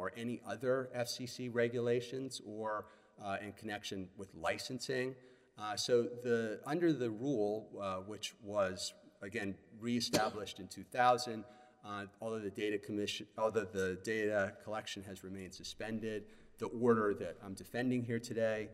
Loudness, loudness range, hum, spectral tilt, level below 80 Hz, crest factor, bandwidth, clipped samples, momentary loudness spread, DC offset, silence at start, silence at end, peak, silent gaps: -38 LUFS; 3 LU; none; -4.5 dB/octave; -72 dBFS; 22 dB; 16 kHz; under 0.1%; 13 LU; under 0.1%; 0 s; 0 s; -16 dBFS; none